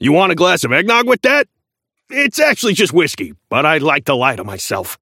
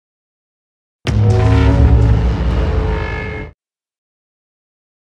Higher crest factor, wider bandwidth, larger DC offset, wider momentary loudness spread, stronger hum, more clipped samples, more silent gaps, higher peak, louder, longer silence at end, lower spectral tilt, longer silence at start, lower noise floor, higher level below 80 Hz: about the same, 14 dB vs 16 dB; first, 17 kHz vs 8 kHz; neither; second, 10 LU vs 14 LU; neither; neither; neither; about the same, 0 dBFS vs 0 dBFS; about the same, -14 LUFS vs -14 LUFS; second, 0.05 s vs 1.55 s; second, -4 dB/octave vs -8 dB/octave; second, 0 s vs 1.05 s; first, -76 dBFS vs -46 dBFS; second, -58 dBFS vs -18 dBFS